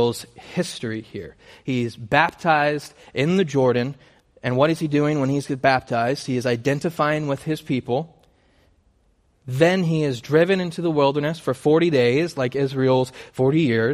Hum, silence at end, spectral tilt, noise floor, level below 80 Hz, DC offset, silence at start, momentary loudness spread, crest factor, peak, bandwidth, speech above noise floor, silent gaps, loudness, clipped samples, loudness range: none; 0 s; -6.5 dB/octave; -62 dBFS; -58 dBFS; under 0.1%; 0 s; 12 LU; 20 dB; -2 dBFS; 15 kHz; 41 dB; none; -21 LUFS; under 0.1%; 4 LU